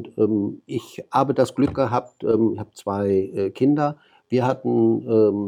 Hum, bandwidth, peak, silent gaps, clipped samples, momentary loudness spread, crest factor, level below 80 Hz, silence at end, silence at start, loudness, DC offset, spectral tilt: none; 14 kHz; -4 dBFS; none; under 0.1%; 8 LU; 16 dB; -56 dBFS; 0 s; 0 s; -22 LUFS; under 0.1%; -8 dB/octave